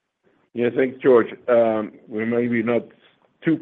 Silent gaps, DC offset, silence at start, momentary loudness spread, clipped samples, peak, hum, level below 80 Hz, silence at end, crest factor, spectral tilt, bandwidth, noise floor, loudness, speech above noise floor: none; under 0.1%; 0.55 s; 11 LU; under 0.1%; -4 dBFS; none; -70 dBFS; 0 s; 18 dB; -9.5 dB/octave; 4.1 kHz; -64 dBFS; -21 LUFS; 44 dB